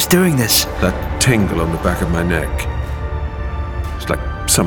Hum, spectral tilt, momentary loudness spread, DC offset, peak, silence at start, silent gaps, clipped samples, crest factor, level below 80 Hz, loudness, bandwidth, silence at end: none; -4 dB/octave; 11 LU; under 0.1%; -2 dBFS; 0 s; none; under 0.1%; 16 dB; -24 dBFS; -17 LUFS; over 20 kHz; 0 s